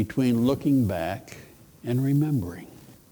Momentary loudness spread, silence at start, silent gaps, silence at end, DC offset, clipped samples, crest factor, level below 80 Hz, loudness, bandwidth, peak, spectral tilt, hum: 18 LU; 0 s; none; 0.2 s; under 0.1%; under 0.1%; 16 dB; -54 dBFS; -25 LUFS; over 20 kHz; -10 dBFS; -8 dB/octave; none